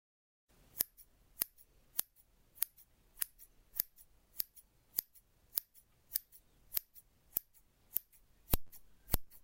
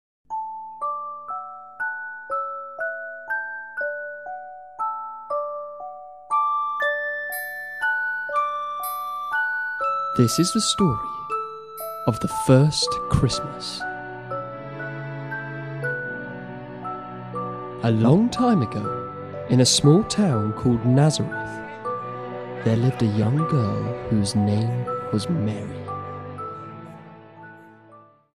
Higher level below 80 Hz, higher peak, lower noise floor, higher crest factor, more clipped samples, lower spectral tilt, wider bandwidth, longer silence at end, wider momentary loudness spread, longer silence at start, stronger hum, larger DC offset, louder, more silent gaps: about the same, -50 dBFS vs -50 dBFS; second, -8 dBFS vs -4 dBFS; first, -69 dBFS vs -51 dBFS; first, 36 dB vs 20 dB; neither; second, -2.5 dB/octave vs -5 dB/octave; first, 17 kHz vs 15 kHz; second, 0.05 s vs 0.3 s; first, 21 LU vs 16 LU; first, 0.75 s vs 0.3 s; neither; second, under 0.1% vs 0.1%; second, -40 LUFS vs -24 LUFS; neither